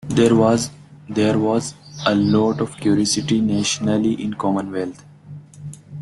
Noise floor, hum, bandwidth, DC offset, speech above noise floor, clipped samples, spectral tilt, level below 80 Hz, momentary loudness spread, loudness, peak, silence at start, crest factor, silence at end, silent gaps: -39 dBFS; none; 12 kHz; under 0.1%; 21 dB; under 0.1%; -5 dB/octave; -52 dBFS; 15 LU; -19 LUFS; -2 dBFS; 0.05 s; 16 dB; 0 s; none